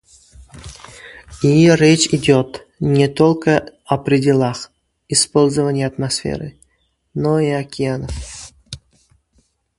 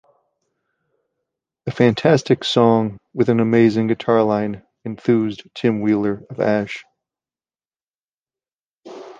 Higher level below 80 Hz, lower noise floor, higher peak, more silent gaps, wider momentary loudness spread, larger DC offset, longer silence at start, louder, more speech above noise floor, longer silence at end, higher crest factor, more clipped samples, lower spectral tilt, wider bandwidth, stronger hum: first, -42 dBFS vs -58 dBFS; second, -64 dBFS vs under -90 dBFS; about the same, 0 dBFS vs -2 dBFS; second, none vs 7.83-7.87 s, 7.95-8.00 s, 8.08-8.20 s, 8.55-8.60 s, 8.67-8.74 s; first, 23 LU vs 15 LU; neither; second, 0.4 s vs 1.65 s; about the same, -16 LUFS vs -18 LUFS; second, 49 dB vs over 73 dB; first, 1.05 s vs 0.05 s; about the same, 18 dB vs 18 dB; neither; second, -5 dB/octave vs -7 dB/octave; first, 11.5 kHz vs 9 kHz; neither